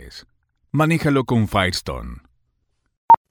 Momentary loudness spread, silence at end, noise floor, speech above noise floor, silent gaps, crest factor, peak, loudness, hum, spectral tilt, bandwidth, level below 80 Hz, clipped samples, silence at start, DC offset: 18 LU; 0.15 s; -70 dBFS; 50 dB; 2.97-3.08 s; 18 dB; -2 dBFS; -19 LUFS; none; -6 dB/octave; 19 kHz; -42 dBFS; under 0.1%; 0 s; under 0.1%